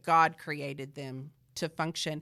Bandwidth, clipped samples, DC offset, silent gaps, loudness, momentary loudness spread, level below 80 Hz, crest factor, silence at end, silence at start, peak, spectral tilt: 15 kHz; under 0.1%; under 0.1%; none; -32 LUFS; 17 LU; -72 dBFS; 20 dB; 0 s; 0.05 s; -12 dBFS; -4 dB/octave